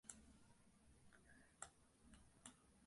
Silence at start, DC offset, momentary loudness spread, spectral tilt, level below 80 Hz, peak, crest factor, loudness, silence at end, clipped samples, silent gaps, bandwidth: 0.05 s; under 0.1%; 4 LU; -2.5 dB/octave; -78 dBFS; -36 dBFS; 30 dB; -62 LUFS; 0 s; under 0.1%; none; 11.5 kHz